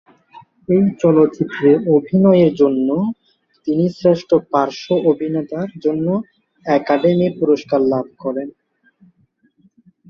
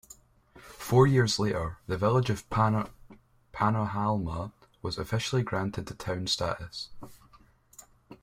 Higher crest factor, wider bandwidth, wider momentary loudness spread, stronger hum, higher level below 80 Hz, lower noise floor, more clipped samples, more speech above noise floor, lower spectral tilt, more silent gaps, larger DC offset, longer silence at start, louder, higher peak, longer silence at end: second, 16 dB vs 22 dB; second, 7 kHz vs 16 kHz; second, 11 LU vs 17 LU; neither; second, -58 dBFS vs -52 dBFS; about the same, -59 dBFS vs -59 dBFS; neither; first, 44 dB vs 31 dB; first, -8.5 dB/octave vs -5.5 dB/octave; neither; neither; second, 0.35 s vs 0.55 s; first, -16 LUFS vs -29 LUFS; first, -2 dBFS vs -8 dBFS; first, 1.6 s vs 0.05 s